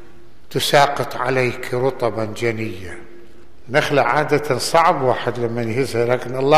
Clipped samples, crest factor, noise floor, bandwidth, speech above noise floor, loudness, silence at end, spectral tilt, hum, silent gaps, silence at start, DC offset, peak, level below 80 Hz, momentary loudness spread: under 0.1%; 18 dB; -47 dBFS; 15 kHz; 29 dB; -19 LUFS; 0 s; -4.5 dB/octave; none; none; 0.5 s; 3%; -2 dBFS; -52 dBFS; 10 LU